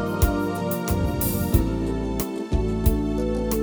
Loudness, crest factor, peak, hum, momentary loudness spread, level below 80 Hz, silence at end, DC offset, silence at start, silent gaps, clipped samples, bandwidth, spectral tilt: -24 LUFS; 18 dB; -4 dBFS; none; 4 LU; -28 dBFS; 0 s; under 0.1%; 0 s; none; under 0.1%; over 20 kHz; -6.5 dB/octave